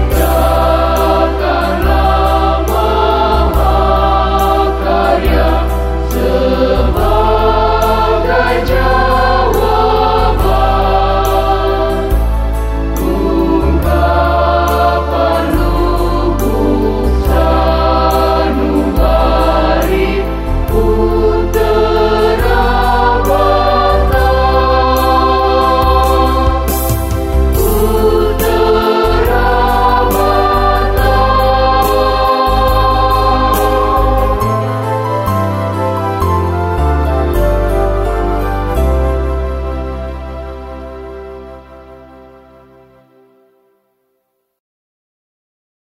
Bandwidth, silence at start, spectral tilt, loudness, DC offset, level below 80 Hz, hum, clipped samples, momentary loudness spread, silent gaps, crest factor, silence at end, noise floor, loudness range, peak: 16.5 kHz; 0 s; -6.5 dB/octave; -12 LUFS; under 0.1%; -16 dBFS; none; under 0.1%; 5 LU; none; 12 dB; 3.95 s; -65 dBFS; 4 LU; 0 dBFS